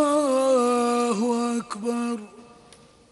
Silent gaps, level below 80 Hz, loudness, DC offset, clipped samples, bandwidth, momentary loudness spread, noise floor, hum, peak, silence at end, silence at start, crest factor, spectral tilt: none; -68 dBFS; -23 LUFS; under 0.1%; under 0.1%; 11.5 kHz; 8 LU; -52 dBFS; none; -10 dBFS; 0.7 s; 0 s; 14 dB; -4.5 dB/octave